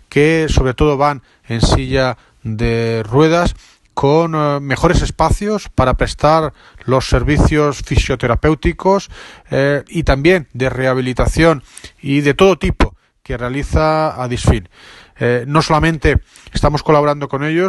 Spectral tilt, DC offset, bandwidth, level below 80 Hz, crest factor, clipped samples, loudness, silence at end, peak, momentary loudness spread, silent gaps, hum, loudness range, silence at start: -6 dB/octave; under 0.1%; 12 kHz; -24 dBFS; 14 dB; under 0.1%; -15 LUFS; 0 s; 0 dBFS; 8 LU; none; none; 1 LU; 0.1 s